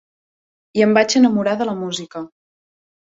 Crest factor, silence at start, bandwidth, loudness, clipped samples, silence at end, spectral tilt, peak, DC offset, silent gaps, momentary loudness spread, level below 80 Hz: 18 dB; 0.75 s; 7.8 kHz; -17 LUFS; under 0.1%; 0.8 s; -4.5 dB/octave; -2 dBFS; under 0.1%; none; 18 LU; -62 dBFS